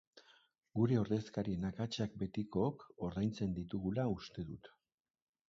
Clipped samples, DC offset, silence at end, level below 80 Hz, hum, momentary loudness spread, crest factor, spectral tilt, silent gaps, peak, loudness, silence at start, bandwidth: under 0.1%; under 0.1%; 0.8 s; -62 dBFS; none; 11 LU; 20 dB; -7.5 dB/octave; none; -20 dBFS; -39 LUFS; 0.15 s; 7.6 kHz